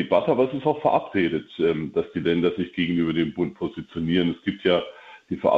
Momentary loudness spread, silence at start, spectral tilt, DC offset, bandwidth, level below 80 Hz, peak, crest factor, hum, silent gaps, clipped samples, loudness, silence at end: 6 LU; 0 s; -8.5 dB/octave; under 0.1%; 6.2 kHz; -56 dBFS; -6 dBFS; 16 dB; none; none; under 0.1%; -24 LUFS; 0 s